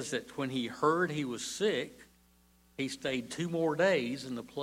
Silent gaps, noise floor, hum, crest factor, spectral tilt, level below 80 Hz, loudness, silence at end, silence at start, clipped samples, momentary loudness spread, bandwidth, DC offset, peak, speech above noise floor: none; -65 dBFS; none; 18 dB; -4.5 dB/octave; -70 dBFS; -33 LUFS; 0 s; 0 s; under 0.1%; 11 LU; 16 kHz; under 0.1%; -16 dBFS; 32 dB